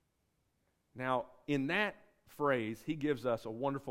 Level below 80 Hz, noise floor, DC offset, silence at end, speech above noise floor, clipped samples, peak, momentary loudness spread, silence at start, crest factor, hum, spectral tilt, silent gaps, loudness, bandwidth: -70 dBFS; -79 dBFS; under 0.1%; 0 s; 43 dB; under 0.1%; -18 dBFS; 5 LU; 0.95 s; 18 dB; none; -6.5 dB/octave; none; -36 LUFS; 16 kHz